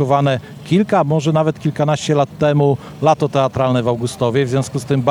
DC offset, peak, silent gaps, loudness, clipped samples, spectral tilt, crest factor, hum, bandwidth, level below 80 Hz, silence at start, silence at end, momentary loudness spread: under 0.1%; 0 dBFS; none; -17 LUFS; under 0.1%; -6.5 dB/octave; 14 dB; none; 13 kHz; -52 dBFS; 0 s; 0 s; 4 LU